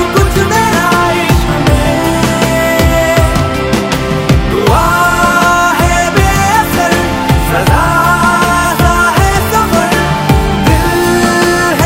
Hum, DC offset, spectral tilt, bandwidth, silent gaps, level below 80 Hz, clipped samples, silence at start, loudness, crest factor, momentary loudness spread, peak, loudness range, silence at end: none; under 0.1%; -5 dB/octave; 16.5 kHz; none; -18 dBFS; 0.2%; 0 s; -9 LUFS; 10 dB; 3 LU; 0 dBFS; 1 LU; 0 s